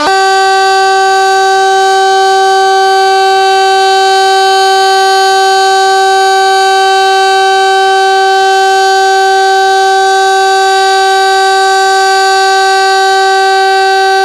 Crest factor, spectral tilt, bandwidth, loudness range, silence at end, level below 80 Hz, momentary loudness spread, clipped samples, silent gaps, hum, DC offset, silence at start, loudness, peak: 6 dB; 0 dB/octave; 14 kHz; 0 LU; 0 s; -52 dBFS; 1 LU; under 0.1%; none; none; under 0.1%; 0 s; -7 LUFS; 0 dBFS